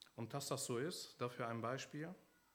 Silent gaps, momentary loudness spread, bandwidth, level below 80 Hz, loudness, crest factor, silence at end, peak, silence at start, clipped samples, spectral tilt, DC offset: none; 8 LU; over 20 kHz; -88 dBFS; -45 LUFS; 18 dB; 0.3 s; -28 dBFS; 0 s; under 0.1%; -4 dB/octave; under 0.1%